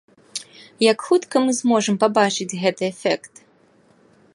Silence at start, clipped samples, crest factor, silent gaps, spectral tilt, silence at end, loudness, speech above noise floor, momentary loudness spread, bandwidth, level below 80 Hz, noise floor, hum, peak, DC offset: 0.35 s; under 0.1%; 20 dB; none; -4 dB/octave; 1.05 s; -20 LUFS; 37 dB; 15 LU; 11.5 kHz; -74 dBFS; -56 dBFS; none; -2 dBFS; under 0.1%